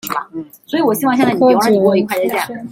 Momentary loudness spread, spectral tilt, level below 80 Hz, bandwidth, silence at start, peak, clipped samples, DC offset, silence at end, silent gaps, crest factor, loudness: 11 LU; -5.5 dB/octave; -58 dBFS; 16.5 kHz; 0.05 s; -2 dBFS; under 0.1%; under 0.1%; 0 s; none; 12 dB; -14 LUFS